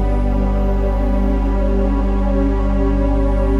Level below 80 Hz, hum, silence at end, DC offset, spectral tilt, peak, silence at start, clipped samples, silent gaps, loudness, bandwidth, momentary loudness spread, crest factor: -16 dBFS; 50 Hz at -20 dBFS; 0 s; under 0.1%; -9.5 dB/octave; -6 dBFS; 0 s; under 0.1%; none; -18 LUFS; 4.3 kHz; 1 LU; 10 dB